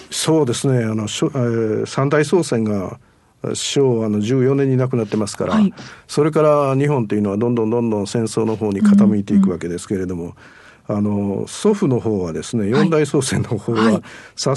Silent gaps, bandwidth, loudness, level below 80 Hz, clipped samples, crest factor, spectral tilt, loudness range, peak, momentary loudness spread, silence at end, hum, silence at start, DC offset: none; 12 kHz; -18 LUFS; -56 dBFS; under 0.1%; 14 dB; -6 dB/octave; 3 LU; -2 dBFS; 9 LU; 0 s; none; 0 s; under 0.1%